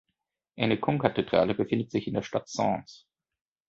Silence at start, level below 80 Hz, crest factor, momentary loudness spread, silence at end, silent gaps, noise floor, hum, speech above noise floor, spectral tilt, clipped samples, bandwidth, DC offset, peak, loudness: 0.55 s; -60 dBFS; 22 dB; 6 LU; 0.7 s; none; -83 dBFS; none; 55 dB; -6 dB/octave; under 0.1%; 7.8 kHz; under 0.1%; -6 dBFS; -28 LUFS